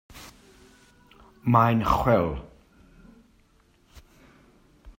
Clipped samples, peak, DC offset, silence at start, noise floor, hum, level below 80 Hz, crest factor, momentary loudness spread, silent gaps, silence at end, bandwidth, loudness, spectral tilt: under 0.1%; -4 dBFS; under 0.1%; 0.15 s; -61 dBFS; none; -44 dBFS; 24 dB; 26 LU; none; 0.1 s; 16 kHz; -23 LUFS; -7.5 dB/octave